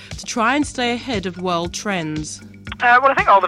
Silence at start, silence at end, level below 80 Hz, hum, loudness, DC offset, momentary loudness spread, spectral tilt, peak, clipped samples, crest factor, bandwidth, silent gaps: 0 s; 0 s; -42 dBFS; none; -18 LUFS; under 0.1%; 15 LU; -4 dB/octave; -4 dBFS; under 0.1%; 14 dB; 14.5 kHz; none